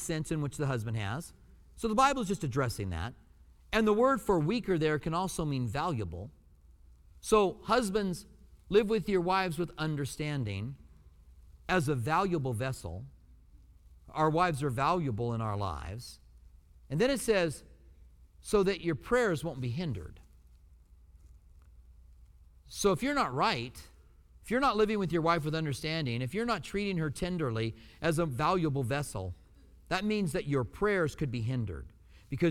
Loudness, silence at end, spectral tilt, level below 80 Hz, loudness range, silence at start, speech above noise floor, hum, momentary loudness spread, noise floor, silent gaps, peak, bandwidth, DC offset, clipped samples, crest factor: -31 LUFS; 0 s; -5.5 dB/octave; -52 dBFS; 4 LU; 0 s; 28 dB; none; 15 LU; -58 dBFS; none; -14 dBFS; 17 kHz; under 0.1%; under 0.1%; 20 dB